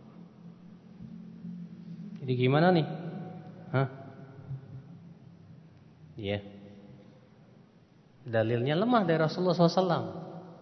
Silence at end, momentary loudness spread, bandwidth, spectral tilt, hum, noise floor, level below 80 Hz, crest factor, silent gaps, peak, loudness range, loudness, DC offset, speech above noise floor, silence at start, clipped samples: 0.05 s; 26 LU; 6.4 kHz; -8 dB/octave; none; -59 dBFS; -72 dBFS; 22 dB; none; -10 dBFS; 14 LU; -29 LUFS; under 0.1%; 32 dB; 0.05 s; under 0.1%